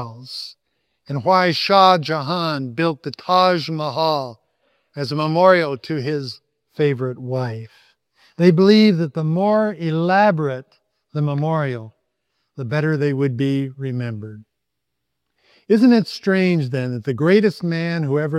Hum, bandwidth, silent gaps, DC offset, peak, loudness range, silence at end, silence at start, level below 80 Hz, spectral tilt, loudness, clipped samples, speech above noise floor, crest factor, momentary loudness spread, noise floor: none; 13 kHz; none; under 0.1%; 0 dBFS; 6 LU; 0 s; 0 s; -68 dBFS; -7 dB/octave; -18 LUFS; under 0.1%; 61 dB; 20 dB; 17 LU; -79 dBFS